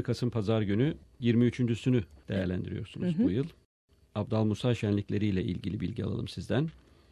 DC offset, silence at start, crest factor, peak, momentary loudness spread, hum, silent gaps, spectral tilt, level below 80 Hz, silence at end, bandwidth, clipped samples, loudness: under 0.1%; 0 s; 16 dB; -14 dBFS; 8 LU; none; 3.65-3.88 s; -8 dB/octave; -50 dBFS; 0.35 s; 11 kHz; under 0.1%; -31 LUFS